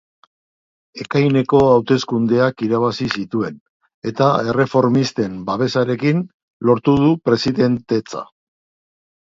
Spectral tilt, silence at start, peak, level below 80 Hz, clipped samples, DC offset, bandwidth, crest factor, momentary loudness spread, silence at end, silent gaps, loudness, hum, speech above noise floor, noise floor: -7 dB/octave; 0.95 s; 0 dBFS; -50 dBFS; under 0.1%; under 0.1%; 7.6 kHz; 18 dB; 9 LU; 1 s; 3.60-3.80 s, 3.94-4.02 s, 6.34-6.60 s; -17 LUFS; none; over 74 dB; under -90 dBFS